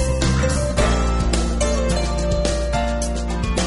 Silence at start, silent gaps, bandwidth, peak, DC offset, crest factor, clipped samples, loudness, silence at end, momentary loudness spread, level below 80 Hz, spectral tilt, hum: 0 s; none; 11.5 kHz; -6 dBFS; under 0.1%; 14 dB; under 0.1%; -21 LUFS; 0 s; 4 LU; -22 dBFS; -5 dB/octave; none